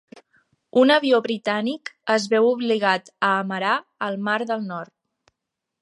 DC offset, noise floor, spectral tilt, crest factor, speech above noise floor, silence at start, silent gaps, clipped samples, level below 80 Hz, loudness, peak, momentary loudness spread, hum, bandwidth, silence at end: under 0.1%; -83 dBFS; -4.5 dB/octave; 18 dB; 62 dB; 0.15 s; none; under 0.1%; -78 dBFS; -21 LUFS; -4 dBFS; 12 LU; none; 11.5 kHz; 0.95 s